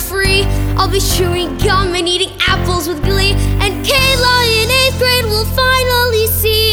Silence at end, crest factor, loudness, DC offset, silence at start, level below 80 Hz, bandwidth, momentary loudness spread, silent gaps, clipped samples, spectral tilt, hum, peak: 0 s; 12 dB; -12 LUFS; under 0.1%; 0 s; -22 dBFS; over 20 kHz; 5 LU; none; under 0.1%; -3.5 dB/octave; none; 0 dBFS